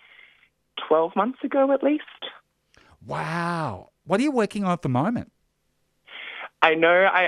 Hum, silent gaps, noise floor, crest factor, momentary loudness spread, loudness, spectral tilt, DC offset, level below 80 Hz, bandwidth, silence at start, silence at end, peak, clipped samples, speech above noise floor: none; none; -71 dBFS; 24 dB; 20 LU; -23 LUFS; -6 dB/octave; under 0.1%; -64 dBFS; 11.5 kHz; 0.75 s; 0 s; 0 dBFS; under 0.1%; 49 dB